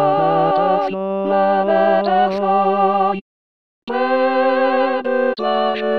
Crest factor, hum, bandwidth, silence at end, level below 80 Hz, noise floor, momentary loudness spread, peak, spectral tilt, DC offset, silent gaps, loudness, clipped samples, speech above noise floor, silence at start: 14 dB; none; 6 kHz; 0 s; -62 dBFS; under -90 dBFS; 5 LU; -4 dBFS; -8 dB/octave; 0.6%; 3.21-3.87 s; -17 LUFS; under 0.1%; over 75 dB; 0 s